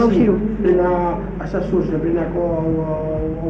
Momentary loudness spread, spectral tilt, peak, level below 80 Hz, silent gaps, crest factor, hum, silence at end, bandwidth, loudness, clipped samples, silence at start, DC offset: 7 LU; -9.5 dB/octave; -4 dBFS; -32 dBFS; none; 14 dB; none; 0 s; 6.6 kHz; -19 LUFS; under 0.1%; 0 s; under 0.1%